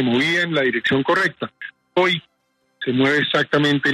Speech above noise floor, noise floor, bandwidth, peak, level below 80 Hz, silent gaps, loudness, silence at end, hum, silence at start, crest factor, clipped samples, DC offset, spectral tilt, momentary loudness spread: 48 dB; -67 dBFS; 13 kHz; -4 dBFS; -62 dBFS; none; -19 LUFS; 0 s; none; 0 s; 16 dB; under 0.1%; under 0.1%; -5.5 dB/octave; 11 LU